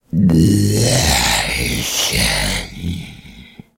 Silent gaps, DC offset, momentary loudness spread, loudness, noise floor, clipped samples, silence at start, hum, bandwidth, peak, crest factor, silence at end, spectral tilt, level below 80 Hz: none; under 0.1%; 13 LU; -15 LUFS; -39 dBFS; under 0.1%; 0.15 s; none; 16.5 kHz; -2 dBFS; 14 dB; 0.35 s; -4 dB/octave; -30 dBFS